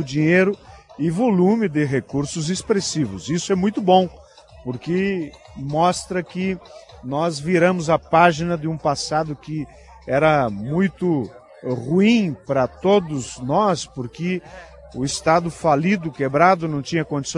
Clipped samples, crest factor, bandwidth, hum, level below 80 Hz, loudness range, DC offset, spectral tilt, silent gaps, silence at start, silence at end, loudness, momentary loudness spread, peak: under 0.1%; 20 dB; 11.5 kHz; none; -50 dBFS; 2 LU; under 0.1%; -5.5 dB/octave; none; 0 s; 0 s; -20 LUFS; 13 LU; 0 dBFS